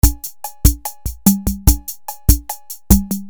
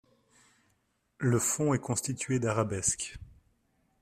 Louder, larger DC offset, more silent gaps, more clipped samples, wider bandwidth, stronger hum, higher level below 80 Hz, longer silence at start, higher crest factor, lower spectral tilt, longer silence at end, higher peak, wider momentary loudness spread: first, -17 LUFS vs -30 LUFS; neither; neither; neither; first, over 20 kHz vs 15.5 kHz; neither; first, -20 dBFS vs -60 dBFS; second, 0.05 s vs 1.2 s; about the same, 16 dB vs 20 dB; about the same, -5 dB/octave vs -4.5 dB/octave; second, 0 s vs 0.7 s; first, 0 dBFS vs -12 dBFS; first, 13 LU vs 8 LU